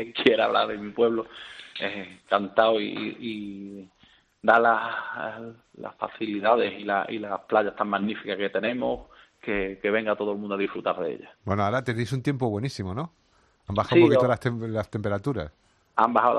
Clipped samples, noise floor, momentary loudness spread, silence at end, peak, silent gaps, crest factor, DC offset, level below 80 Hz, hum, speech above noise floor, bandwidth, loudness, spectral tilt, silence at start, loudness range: under 0.1%; -60 dBFS; 17 LU; 0 s; -4 dBFS; none; 22 dB; under 0.1%; -58 dBFS; none; 34 dB; 11 kHz; -26 LUFS; -6.5 dB/octave; 0 s; 4 LU